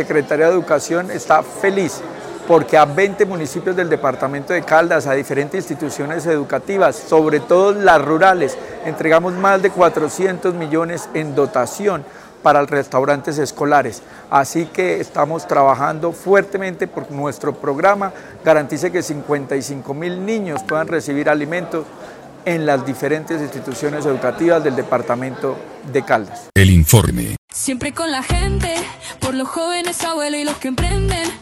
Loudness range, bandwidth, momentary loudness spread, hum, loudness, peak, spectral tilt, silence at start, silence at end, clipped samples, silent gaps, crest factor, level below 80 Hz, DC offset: 6 LU; 16.5 kHz; 11 LU; none; -17 LUFS; 0 dBFS; -5 dB/octave; 0 s; 0 s; under 0.1%; 27.38-27.48 s; 16 dB; -34 dBFS; under 0.1%